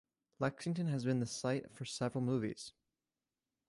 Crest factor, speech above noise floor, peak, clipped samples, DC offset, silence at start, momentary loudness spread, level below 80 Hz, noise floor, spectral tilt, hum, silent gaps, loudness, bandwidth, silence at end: 18 dB; over 52 dB; -22 dBFS; under 0.1%; under 0.1%; 0.4 s; 8 LU; -74 dBFS; under -90 dBFS; -6 dB/octave; none; none; -38 LUFS; 11.5 kHz; 1 s